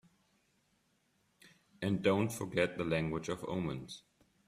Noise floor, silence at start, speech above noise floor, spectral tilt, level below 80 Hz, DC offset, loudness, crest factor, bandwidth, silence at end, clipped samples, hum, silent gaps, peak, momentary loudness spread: -76 dBFS; 1.45 s; 41 dB; -6 dB/octave; -66 dBFS; under 0.1%; -35 LUFS; 22 dB; 15 kHz; 0.5 s; under 0.1%; none; none; -16 dBFS; 12 LU